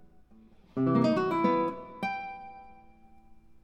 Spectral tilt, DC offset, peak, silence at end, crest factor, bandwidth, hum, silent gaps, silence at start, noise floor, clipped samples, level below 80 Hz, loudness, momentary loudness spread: -8 dB/octave; under 0.1%; -12 dBFS; 0.25 s; 18 dB; 8.6 kHz; none; none; 0 s; -57 dBFS; under 0.1%; -64 dBFS; -29 LUFS; 19 LU